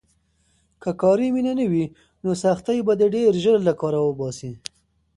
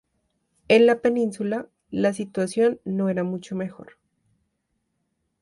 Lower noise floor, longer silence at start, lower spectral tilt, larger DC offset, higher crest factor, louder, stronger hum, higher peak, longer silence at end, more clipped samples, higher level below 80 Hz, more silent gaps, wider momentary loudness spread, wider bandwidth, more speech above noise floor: second, -64 dBFS vs -75 dBFS; first, 0.85 s vs 0.7 s; about the same, -6.5 dB/octave vs -6 dB/octave; neither; about the same, 16 dB vs 18 dB; about the same, -21 LUFS vs -23 LUFS; neither; about the same, -6 dBFS vs -6 dBFS; second, 0.6 s vs 1.6 s; neither; first, -58 dBFS vs -66 dBFS; neither; about the same, 13 LU vs 14 LU; about the same, 11.5 kHz vs 11.5 kHz; second, 44 dB vs 53 dB